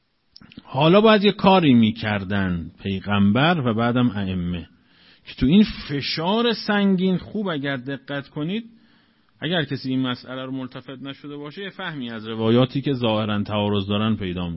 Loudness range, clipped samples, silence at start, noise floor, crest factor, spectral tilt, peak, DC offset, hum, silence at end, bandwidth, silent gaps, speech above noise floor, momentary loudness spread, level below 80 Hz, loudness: 10 LU; under 0.1%; 0.55 s; -59 dBFS; 20 dB; -10 dB/octave; -2 dBFS; under 0.1%; none; 0 s; 5.8 kHz; none; 38 dB; 15 LU; -48 dBFS; -21 LUFS